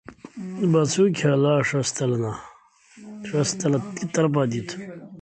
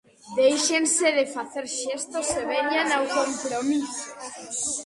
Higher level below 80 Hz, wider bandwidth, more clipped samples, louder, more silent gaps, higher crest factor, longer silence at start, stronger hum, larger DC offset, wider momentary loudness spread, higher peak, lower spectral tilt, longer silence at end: about the same, -62 dBFS vs -62 dBFS; second, 9.2 kHz vs 11.5 kHz; neither; about the same, -23 LUFS vs -24 LUFS; neither; about the same, 16 dB vs 16 dB; second, 0.1 s vs 0.25 s; neither; neither; first, 18 LU vs 12 LU; about the same, -8 dBFS vs -10 dBFS; first, -5.5 dB/octave vs -1 dB/octave; about the same, 0 s vs 0 s